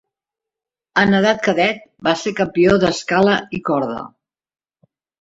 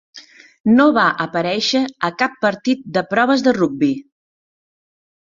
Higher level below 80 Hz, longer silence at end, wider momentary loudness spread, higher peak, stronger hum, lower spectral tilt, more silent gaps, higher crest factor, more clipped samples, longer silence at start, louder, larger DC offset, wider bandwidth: first, -50 dBFS vs -58 dBFS; about the same, 1.15 s vs 1.2 s; about the same, 8 LU vs 8 LU; about the same, -2 dBFS vs -2 dBFS; neither; about the same, -5.5 dB/octave vs -5 dB/octave; second, none vs 0.60-0.64 s; about the same, 18 dB vs 18 dB; neither; first, 0.95 s vs 0.15 s; about the same, -17 LUFS vs -17 LUFS; neither; about the same, 8 kHz vs 7.6 kHz